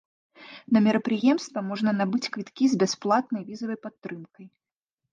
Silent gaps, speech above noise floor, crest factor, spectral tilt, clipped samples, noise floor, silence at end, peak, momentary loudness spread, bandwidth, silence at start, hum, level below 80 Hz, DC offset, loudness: 3.98-4.02 s; 61 dB; 18 dB; -5.5 dB/octave; under 0.1%; -86 dBFS; 0.65 s; -10 dBFS; 17 LU; 9 kHz; 0.4 s; none; -74 dBFS; under 0.1%; -25 LUFS